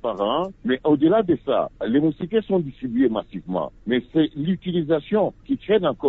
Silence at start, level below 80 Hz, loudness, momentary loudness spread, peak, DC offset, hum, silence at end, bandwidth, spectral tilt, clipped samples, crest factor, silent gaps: 0.05 s; -52 dBFS; -22 LUFS; 9 LU; -8 dBFS; under 0.1%; none; 0 s; 4.1 kHz; -9.5 dB/octave; under 0.1%; 14 dB; none